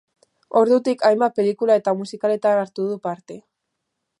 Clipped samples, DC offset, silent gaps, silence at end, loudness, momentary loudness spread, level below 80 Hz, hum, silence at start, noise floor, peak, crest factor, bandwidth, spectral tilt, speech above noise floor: under 0.1%; under 0.1%; none; 0.8 s; -20 LUFS; 11 LU; -76 dBFS; none; 0.55 s; -78 dBFS; -4 dBFS; 18 dB; 11 kHz; -6 dB/octave; 59 dB